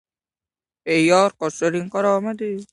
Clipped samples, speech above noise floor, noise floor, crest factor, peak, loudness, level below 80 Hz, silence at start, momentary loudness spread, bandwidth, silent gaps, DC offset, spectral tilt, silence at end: under 0.1%; over 70 dB; under -90 dBFS; 18 dB; -2 dBFS; -20 LUFS; -66 dBFS; 0.85 s; 10 LU; 11.5 kHz; none; under 0.1%; -5 dB/octave; 0.1 s